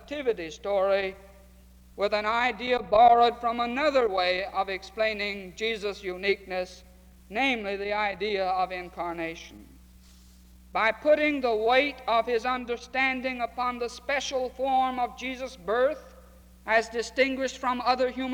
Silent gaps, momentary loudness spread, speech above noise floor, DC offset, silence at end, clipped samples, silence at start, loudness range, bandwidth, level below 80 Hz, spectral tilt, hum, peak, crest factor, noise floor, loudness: none; 11 LU; 26 dB; under 0.1%; 0 s; under 0.1%; 0 s; 6 LU; 19 kHz; -54 dBFS; -3.5 dB/octave; none; -8 dBFS; 20 dB; -53 dBFS; -27 LUFS